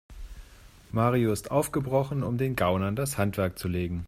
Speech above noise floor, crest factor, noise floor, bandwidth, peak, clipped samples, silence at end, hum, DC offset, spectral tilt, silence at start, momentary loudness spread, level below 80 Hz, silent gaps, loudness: 24 dB; 18 dB; -51 dBFS; 16 kHz; -10 dBFS; under 0.1%; 0 s; none; under 0.1%; -6.5 dB/octave; 0.1 s; 8 LU; -48 dBFS; none; -28 LUFS